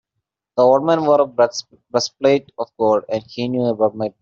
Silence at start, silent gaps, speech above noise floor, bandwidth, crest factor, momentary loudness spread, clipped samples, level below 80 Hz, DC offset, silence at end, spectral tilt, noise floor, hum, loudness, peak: 0.55 s; none; 61 dB; 7.6 kHz; 16 dB; 10 LU; under 0.1%; -62 dBFS; under 0.1%; 0.1 s; -4.5 dB/octave; -79 dBFS; none; -18 LUFS; -2 dBFS